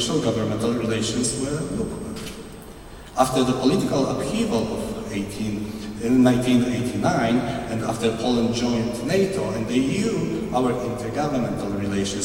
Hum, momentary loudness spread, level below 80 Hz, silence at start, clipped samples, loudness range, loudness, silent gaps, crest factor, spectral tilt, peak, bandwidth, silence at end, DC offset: none; 10 LU; -44 dBFS; 0 s; under 0.1%; 3 LU; -23 LUFS; none; 20 dB; -5.5 dB/octave; -2 dBFS; 16.5 kHz; 0 s; under 0.1%